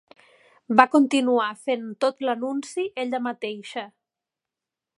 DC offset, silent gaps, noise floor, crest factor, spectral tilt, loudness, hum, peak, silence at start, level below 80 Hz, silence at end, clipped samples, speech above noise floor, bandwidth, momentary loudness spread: under 0.1%; none; -88 dBFS; 24 dB; -4 dB/octave; -23 LUFS; none; 0 dBFS; 0.7 s; -76 dBFS; 1.15 s; under 0.1%; 65 dB; 11.5 kHz; 15 LU